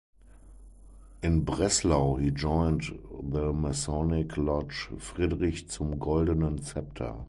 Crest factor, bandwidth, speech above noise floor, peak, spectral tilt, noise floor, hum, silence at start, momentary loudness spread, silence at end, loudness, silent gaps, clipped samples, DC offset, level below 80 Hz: 18 dB; 11.5 kHz; 23 dB; -12 dBFS; -5.5 dB/octave; -51 dBFS; none; 0.35 s; 11 LU; 0 s; -29 LUFS; none; under 0.1%; under 0.1%; -38 dBFS